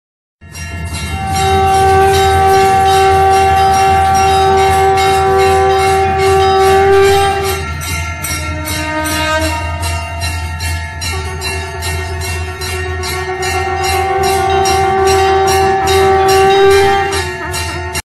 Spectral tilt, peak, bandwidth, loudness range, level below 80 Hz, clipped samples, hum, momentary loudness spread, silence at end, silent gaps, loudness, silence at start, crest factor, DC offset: -4.5 dB/octave; -2 dBFS; 15 kHz; 8 LU; -28 dBFS; under 0.1%; none; 10 LU; 0.1 s; none; -12 LUFS; 0.45 s; 8 dB; under 0.1%